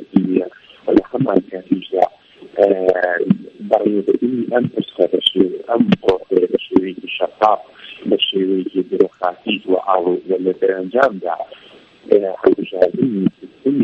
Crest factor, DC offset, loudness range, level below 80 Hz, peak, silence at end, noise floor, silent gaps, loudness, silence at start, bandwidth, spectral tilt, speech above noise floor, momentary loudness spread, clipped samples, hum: 18 dB; under 0.1%; 2 LU; -54 dBFS; 0 dBFS; 0 s; -40 dBFS; none; -17 LUFS; 0 s; 9.8 kHz; -7.5 dB/octave; 23 dB; 7 LU; under 0.1%; none